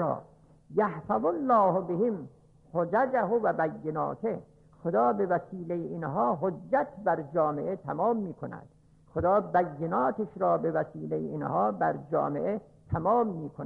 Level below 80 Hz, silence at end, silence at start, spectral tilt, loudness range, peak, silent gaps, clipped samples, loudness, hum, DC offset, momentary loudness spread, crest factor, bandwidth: -62 dBFS; 0 s; 0 s; -10.5 dB/octave; 2 LU; -14 dBFS; none; under 0.1%; -29 LUFS; none; under 0.1%; 10 LU; 14 dB; 4.9 kHz